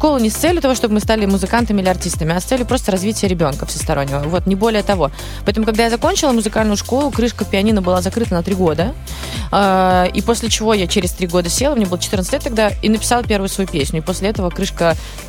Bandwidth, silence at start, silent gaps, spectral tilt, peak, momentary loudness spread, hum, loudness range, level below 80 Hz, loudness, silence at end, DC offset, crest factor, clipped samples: 17 kHz; 0 s; none; -4.5 dB/octave; -2 dBFS; 4 LU; none; 2 LU; -28 dBFS; -16 LUFS; 0 s; under 0.1%; 14 dB; under 0.1%